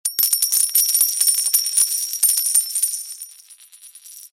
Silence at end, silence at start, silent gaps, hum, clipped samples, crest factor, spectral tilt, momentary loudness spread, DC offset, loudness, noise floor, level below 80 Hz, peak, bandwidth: 0.05 s; 0.05 s; none; none; under 0.1%; 16 dB; 6 dB/octave; 12 LU; under 0.1%; -16 LUFS; -46 dBFS; -86 dBFS; -4 dBFS; 17 kHz